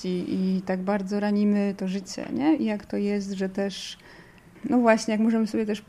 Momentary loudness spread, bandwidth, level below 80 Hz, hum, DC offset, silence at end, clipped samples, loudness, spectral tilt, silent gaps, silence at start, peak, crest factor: 10 LU; 11.5 kHz; -60 dBFS; none; under 0.1%; 0.1 s; under 0.1%; -25 LUFS; -6 dB/octave; none; 0 s; -6 dBFS; 18 dB